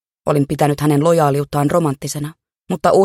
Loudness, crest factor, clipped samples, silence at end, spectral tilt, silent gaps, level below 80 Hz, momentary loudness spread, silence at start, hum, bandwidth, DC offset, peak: -17 LUFS; 16 dB; under 0.1%; 0 s; -6.5 dB/octave; none; -48 dBFS; 12 LU; 0.25 s; none; 15.5 kHz; under 0.1%; 0 dBFS